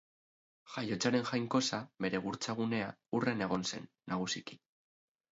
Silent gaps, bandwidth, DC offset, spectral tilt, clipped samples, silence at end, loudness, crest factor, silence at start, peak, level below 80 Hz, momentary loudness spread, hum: none; 7.6 kHz; under 0.1%; -4 dB/octave; under 0.1%; 0.75 s; -36 LUFS; 18 dB; 0.65 s; -18 dBFS; -72 dBFS; 8 LU; none